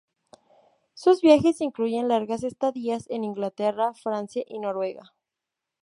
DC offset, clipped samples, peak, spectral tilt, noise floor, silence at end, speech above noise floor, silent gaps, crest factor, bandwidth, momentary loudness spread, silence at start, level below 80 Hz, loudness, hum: under 0.1%; under 0.1%; -4 dBFS; -6 dB/octave; -86 dBFS; 0.8 s; 62 dB; none; 20 dB; 11.5 kHz; 13 LU; 0.95 s; -64 dBFS; -25 LUFS; none